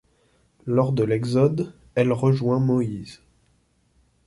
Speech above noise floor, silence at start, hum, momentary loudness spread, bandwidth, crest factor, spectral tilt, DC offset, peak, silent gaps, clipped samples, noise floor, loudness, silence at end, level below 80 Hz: 43 dB; 0.65 s; none; 11 LU; 11.5 kHz; 18 dB; -8.5 dB/octave; under 0.1%; -6 dBFS; none; under 0.1%; -64 dBFS; -22 LUFS; 1.1 s; -56 dBFS